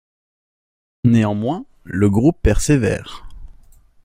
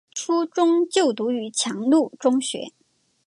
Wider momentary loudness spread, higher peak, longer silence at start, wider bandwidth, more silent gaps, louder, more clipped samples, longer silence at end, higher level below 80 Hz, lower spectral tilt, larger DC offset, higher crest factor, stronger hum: first, 13 LU vs 8 LU; first, -2 dBFS vs -6 dBFS; first, 1.05 s vs 0.15 s; first, 16 kHz vs 11.5 kHz; neither; first, -18 LUFS vs -22 LUFS; neither; about the same, 0.6 s vs 0.55 s; first, -30 dBFS vs -78 dBFS; first, -6.5 dB/octave vs -3 dB/octave; neither; about the same, 16 dB vs 16 dB; neither